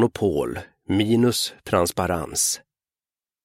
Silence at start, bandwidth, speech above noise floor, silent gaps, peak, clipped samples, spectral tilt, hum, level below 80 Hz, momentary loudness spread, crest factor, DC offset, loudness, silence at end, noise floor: 0 s; 16.5 kHz; over 68 dB; none; -6 dBFS; under 0.1%; -4 dB/octave; none; -50 dBFS; 9 LU; 16 dB; under 0.1%; -22 LUFS; 0.85 s; under -90 dBFS